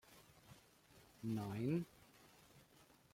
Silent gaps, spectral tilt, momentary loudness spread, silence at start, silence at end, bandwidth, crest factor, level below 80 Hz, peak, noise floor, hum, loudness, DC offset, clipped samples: none; -7.5 dB/octave; 25 LU; 0.1 s; 0.3 s; 16.5 kHz; 18 dB; -78 dBFS; -30 dBFS; -69 dBFS; none; -44 LUFS; under 0.1%; under 0.1%